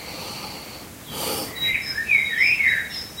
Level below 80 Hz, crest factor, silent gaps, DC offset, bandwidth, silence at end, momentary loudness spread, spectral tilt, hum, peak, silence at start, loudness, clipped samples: -52 dBFS; 18 dB; none; under 0.1%; 16 kHz; 0 s; 18 LU; -1.5 dB/octave; none; -6 dBFS; 0 s; -20 LUFS; under 0.1%